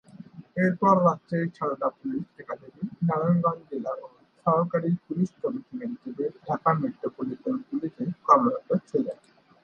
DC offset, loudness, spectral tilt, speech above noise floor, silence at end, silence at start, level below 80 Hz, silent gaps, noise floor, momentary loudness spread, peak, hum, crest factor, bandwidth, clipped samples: under 0.1%; -27 LUFS; -9.5 dB/octave; 20 dB; 0.5 s; 0.15 s; -70 dBFS; none; -46 dBFS; 15 LU; -4 dBFS; none; 22 dB; 6.8 kHz; under 0.1%